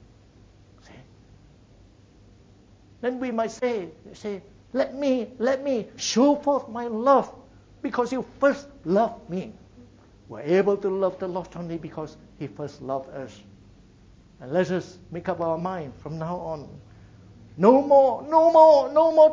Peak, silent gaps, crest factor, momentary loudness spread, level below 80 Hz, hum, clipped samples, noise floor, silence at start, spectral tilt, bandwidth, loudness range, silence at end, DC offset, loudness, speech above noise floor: -2 dBFS; none; 22 dB; 20 LU; -58 dBFS; none; under 0.1%; -53 dBFS; 3 s; -6 dB/octave; 7.6 kHz; 10 LU; 0 s; under 0.1%; -23 LUFS; 31 dB